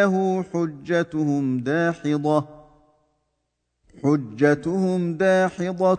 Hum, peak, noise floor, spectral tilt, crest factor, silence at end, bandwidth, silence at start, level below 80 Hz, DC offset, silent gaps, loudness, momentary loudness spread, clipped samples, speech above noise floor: 60 Hz at -60 dBFS; -4 dBFS; -76 dBFS; -7.5 dB/octave; 18 dB; 0 s; 9.4 kHz; 0 s; -62 dBFS; under 0.1%; none; -22 LUFS; 5 LU; under 0.1%; 55 dB